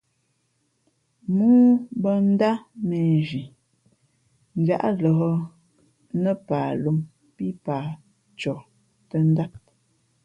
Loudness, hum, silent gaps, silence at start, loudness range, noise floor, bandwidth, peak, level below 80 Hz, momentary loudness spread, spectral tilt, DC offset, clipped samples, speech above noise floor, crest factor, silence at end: -23 LUFS; none; none; 1.3 s; 7 LU; -70 dBFS; 7.6 kHz; -8 dBFS; -64 dBFS; 16 LU; -9.5 dB/octave; under 0.1%; under 0.1%; 49 dB; 16 dB; 0.65 s